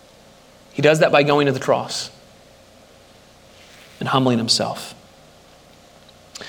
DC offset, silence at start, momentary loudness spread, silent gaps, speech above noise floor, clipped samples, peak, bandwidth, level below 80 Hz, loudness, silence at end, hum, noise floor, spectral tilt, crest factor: under 0.1%; 0.75 s; 18 LU; none; 31 dB; under 0.1%; 0 dBFS; 17 kHz; -60 dBFS; -18 LUFS; 0 s; none; -48 dBFS; -4.5 dB/octave; 22 dB